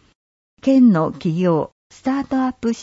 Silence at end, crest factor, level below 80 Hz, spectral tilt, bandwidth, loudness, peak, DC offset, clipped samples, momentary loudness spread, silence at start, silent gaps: 0 s; 14 dB; -54 dBFS; -8 dB/octave; 7.8 kHz; -18 LUFS; -6 dBFS; under 0.1%; under 0.1%; 11 LU; 0.65 s; 1.72-1.90 s